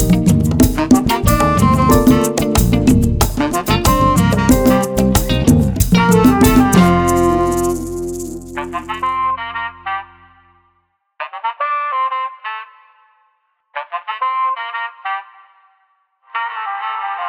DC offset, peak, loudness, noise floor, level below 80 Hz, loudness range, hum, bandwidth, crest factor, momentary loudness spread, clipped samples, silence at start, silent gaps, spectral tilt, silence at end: under 0.1%; 0 dBFS; -15 LUFS; -63 dBFS; -26 dBFS; 11 LU; none; over 20 kHz; 14 dB; 14 LU; under 0.1%; 0 s; none; -5.5 dB/octave; 0 s